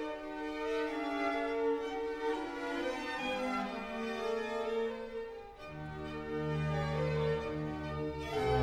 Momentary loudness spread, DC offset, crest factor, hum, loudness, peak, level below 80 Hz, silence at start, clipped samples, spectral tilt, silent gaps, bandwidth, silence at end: 8 LU; under 0.1%; 18 dB; none; -37 LUFS; -18 dBFS; -54 dBFS; 0 s; under 0.1%; -6.5 dB/octave; none; 13.5 kHz; 0 s